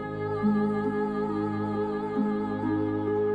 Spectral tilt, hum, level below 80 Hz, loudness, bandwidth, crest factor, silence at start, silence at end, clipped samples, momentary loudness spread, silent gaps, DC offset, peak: -9.5 dB/octave; none; -56 dBFS; -28 LUFS; 7.8 kHz; 12 dB; 0 s; 0 s; under 0.1%; 3 LU; none; under 0.1%; -16 dBFS